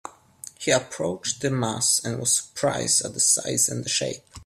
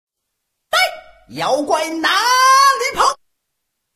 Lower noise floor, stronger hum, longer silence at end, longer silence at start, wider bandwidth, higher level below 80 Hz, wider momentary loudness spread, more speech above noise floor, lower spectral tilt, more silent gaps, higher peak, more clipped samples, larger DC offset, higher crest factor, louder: second, -45 dBFS vs -76 dBFS; neither; second, 0 s vs 0.8 s; second, 0.05 s vs 0.7 s; about the same, 16 kHz vs 15.5 kHz; about the same, -60 dBFS vs -56 dBFS; about the same, 10 LU vs 11 LU; second, 21 dB vs 60 dB; first, -2.5 dB/octave vs -0.5 dB/octave; neither; second, -6 dBFS vs -2 dBFS; neither; neither; about the same, 20 dB vs 16 dB; second, -23 LUFS vs -15 LUFS